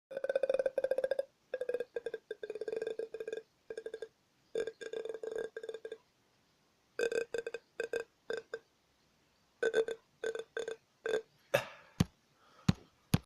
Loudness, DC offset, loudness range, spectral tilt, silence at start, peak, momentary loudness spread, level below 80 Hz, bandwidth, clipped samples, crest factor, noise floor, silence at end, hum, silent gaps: -39 LUFS; under 0.1%; 6 LU; -5.5 dB/octave; 0.1 s; -14 dBFS; 13 LU; -64 dBFS; 15.5 kHz; under 0.1%; 26 dB; -73 dBFS; 0.05 s; none; none